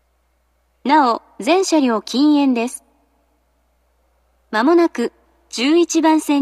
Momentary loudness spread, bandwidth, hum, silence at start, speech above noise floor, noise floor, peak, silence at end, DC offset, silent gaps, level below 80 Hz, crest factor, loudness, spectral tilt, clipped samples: 12 LU; 14 kHz; none; 0.85 s; 47 dB; -63 dBFS; -2 dBFS; 0 s; under 0.1%; none; -64 dBFS; 16 dB; -16 LUFS; -3 dB/octave; under 0.1%